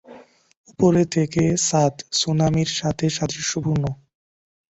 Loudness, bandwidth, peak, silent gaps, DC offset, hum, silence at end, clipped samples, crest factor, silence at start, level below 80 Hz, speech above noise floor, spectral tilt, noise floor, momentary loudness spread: -21 LUFS; 8.2 kHz; -4 dBFS; 0.57-0.64 s; under 0.1%; none; 0.75 s; under 0.1%; 18 dB; 0.1 s; -48 dBFS; 26 dB; -5 dB/octave; -46 dBFS; 6 LU